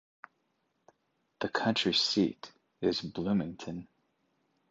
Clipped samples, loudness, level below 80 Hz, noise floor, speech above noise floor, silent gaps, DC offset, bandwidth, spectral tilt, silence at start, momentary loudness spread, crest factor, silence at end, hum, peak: under 0.1%; -31 LUFS; -66 dBFS; -78 dBFS; 47 dB; none; under 0.1%; 8 kHz; -4.5 dB/octave; 1.4 s; 17 LU; 20 dB; 0.85 s; none; -14 dBFS